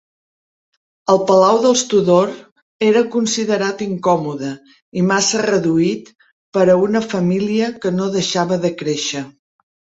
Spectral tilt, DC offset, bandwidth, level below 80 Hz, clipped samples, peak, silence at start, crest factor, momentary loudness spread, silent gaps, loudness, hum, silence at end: -4.5 dB/octave; under 0.1%; 8.2 kHz; -58 dBFS; under 0.1%; -2 dBFS; 1.1 s; 16 dB; 13 LU; 2.52-2.56 s, 2.62-2.79 s, 4.82-4.92 s, 6.32-6.52 s; -16 LUFS; none; 0.7 s